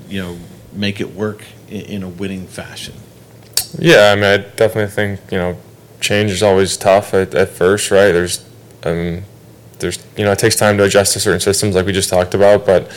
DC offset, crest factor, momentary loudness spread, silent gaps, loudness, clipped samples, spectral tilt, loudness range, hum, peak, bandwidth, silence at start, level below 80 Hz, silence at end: under 0.1%; 14 dB; 17 LU; none; -14 LUFS; under 0.1%; -4 dB/octave; 5 LU; none; 0 dBFS; 18.5 kHz; 0 s; -46 dBFS; 0 s